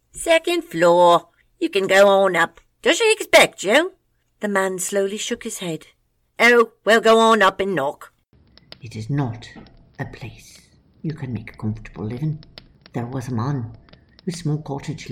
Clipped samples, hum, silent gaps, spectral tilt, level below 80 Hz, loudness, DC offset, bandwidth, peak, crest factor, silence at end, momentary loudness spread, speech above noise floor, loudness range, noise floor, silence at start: under 0.1%; none; none; -4 dB/octave; -52 dBFS; -19 LUFS; under 0.1%; 18.5 kHz; -2 dBFS; 18 dB; 0 s; 19 LU; 36 dB; 14 LU; -55 dBFS; 0.15 s